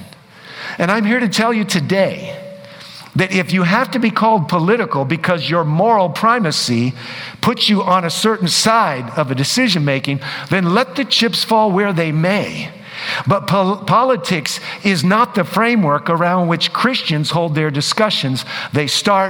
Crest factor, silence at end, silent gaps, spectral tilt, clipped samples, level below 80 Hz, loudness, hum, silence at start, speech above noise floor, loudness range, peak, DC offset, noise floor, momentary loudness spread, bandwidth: 16 dB; 0 s; none; -4.5 dB/octave; under 0.1%; -58 dBFS; -15 LUFS; none; 0 s; 23 dB; 2 LU; 0 dBFS; under 0.1%; -39 dBFS; 8 LU; over 20 kHz